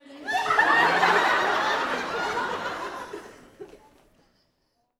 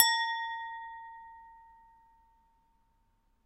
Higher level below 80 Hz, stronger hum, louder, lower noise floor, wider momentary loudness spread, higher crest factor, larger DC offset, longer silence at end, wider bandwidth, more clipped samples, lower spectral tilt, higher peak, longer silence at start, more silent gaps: first, -62 dBFS vs -72 dBFS; neither; first, -23 LUFS vs -32 LUFS; about the same, -72 dBFS vs -71 dBFS; second, 16 LU vs 24 LU; second, 20 dB vs 30 dB; neither; second, 1.25 s vs 1.85 s; first, 17.5 kHz vs 13 kHz; neither; first, -2.5 dB/octave vs 4 dB/octave; about the same, -6 dBFS vs -6 dBFS; about the same, 0.1 s vs 0 s; neither